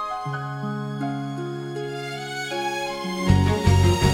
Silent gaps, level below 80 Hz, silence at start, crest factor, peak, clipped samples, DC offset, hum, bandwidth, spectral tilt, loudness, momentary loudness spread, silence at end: none; -38 dBFS; 0 s; 18 dB; -4 dBFS; under 0.1%; under 0.1%; none; 15.5 kHz; -6 dB/octave; -24 LUFS; 12 LU; 0 s